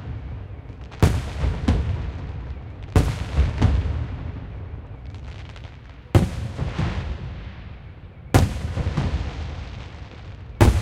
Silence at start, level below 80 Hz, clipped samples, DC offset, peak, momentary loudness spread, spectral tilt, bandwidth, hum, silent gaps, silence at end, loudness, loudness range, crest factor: 0 s; -28 dBFS; under 0.1%; under 0.1%; 0 dBFS; 18 LU; -6.5 dB/octave; 16 kHz; none; none; 0 s; -25 LUFS; 4 LU; 22 dB